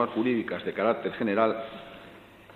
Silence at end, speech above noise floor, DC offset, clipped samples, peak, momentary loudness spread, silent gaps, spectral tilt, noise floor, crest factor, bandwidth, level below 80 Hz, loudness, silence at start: 0 s; 22 dB; under 0.1%; under 0.1%; -10 dBFS; 20 LU; none; -8 dB/octave; -50 dBFS; 18 dB; 5 kHz; -66 dBFS; -28 LUFS; 0 s